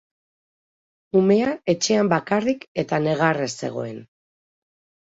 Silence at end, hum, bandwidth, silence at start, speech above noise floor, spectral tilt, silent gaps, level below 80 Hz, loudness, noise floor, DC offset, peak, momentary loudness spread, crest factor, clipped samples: 1.1 s; none; 8 kHz; 1.15 s; over 69 dB; -5 dB/octave; 2.68-2.75 s; -64 dBFS; -21 LUFS; under -90 dBFS; under 0.1%; -6 dBFS; 11 LU; 18 dB; under 0.1%